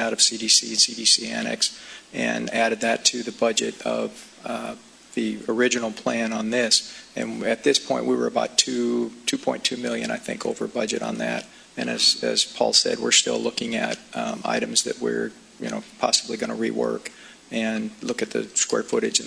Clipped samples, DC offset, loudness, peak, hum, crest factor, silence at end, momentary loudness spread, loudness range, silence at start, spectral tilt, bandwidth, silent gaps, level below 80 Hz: under 0.1%; under 0.1%; -23 LUFS; 0 dBFS; none; 24 dB; 0 s; 14 LU; 5 LU; 0 s; -1.5 dB/octave; 11 kHz; none; -66 dBFS